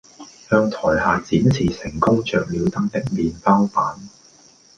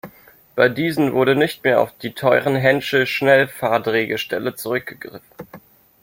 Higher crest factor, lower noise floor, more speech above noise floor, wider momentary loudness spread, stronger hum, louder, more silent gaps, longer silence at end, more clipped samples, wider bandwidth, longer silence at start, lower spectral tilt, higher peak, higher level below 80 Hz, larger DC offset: about the same, 18 dB vs 18 dB; about the same, -51 dBFS vs -49 dBFS; about the same, 32 dB vs 30 dB; second, 6 LU vs 10 LU; neither; about the same, -19 LUFS vs -18 LUFS; neither; first, 0.7 s vs 0.45 s; neither; second, 9.2 kHz vs 16.5 kHz; first, 0.2 s vs 0.05 s; first, -7 dB/octave vs -5.5 dB/octave; about the same, -2 dBFS vs -2 dBFS; first, -44 dBFS vs -60 dBFS; neither